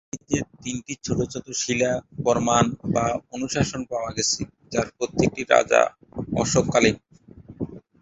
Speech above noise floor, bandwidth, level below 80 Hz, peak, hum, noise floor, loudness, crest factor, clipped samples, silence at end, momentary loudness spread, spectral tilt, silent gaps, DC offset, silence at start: 23 dB; 8.4 kHz; -48 dBFS; -2 dBFS; none; -46 dBFS; -23 LUFS; 22 dB; under 0.1%; 0.25 s; 12 LU; -4 dB/octave; none; under 0.1%; 0.15 s